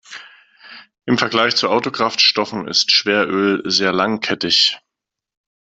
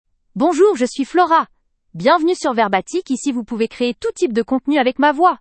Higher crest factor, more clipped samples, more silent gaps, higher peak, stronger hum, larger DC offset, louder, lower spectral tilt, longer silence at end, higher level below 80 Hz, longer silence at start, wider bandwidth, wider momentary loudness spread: about the same, 18 dB vs 16 dB; neither; neither; about the same, 0 dBFS vs 0 dBFS; neither; neither; about the same, -15 LUFS vs -17 LUFS; second, -3 dB/octave vs -4.5 dB/octave; first, 0.85 s vs 0.05 s; second, -62 dBFS vs -56 dBFS; second, 0.1 s vs 0.35 s; about the same, 8.2 kHz vs 8.8 kHz; about the same, 8 LU vs 8 LU